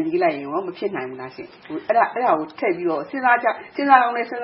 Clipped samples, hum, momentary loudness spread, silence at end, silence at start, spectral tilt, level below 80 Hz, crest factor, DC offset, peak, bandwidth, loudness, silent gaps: under 0.1%; none; 17 LU; 0 s; 0 s; -9.5 dB/octave; -68 dBFS; 20 dB; under 0.1%; 0 dBFS; 5.8 kHz; -20 LUFS; none